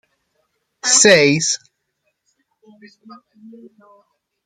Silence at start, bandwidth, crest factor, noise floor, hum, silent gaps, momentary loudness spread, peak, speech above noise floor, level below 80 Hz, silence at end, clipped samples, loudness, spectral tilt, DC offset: 0.85 s; 13 kHz; 20 dB; -71 dBFS; none; none; 14 LU; 0 dBFS; 57 dB; -64 dBFS; 2.9 s; under 0.1%; -13 LUFS; -2 dB/octave; under 0.1%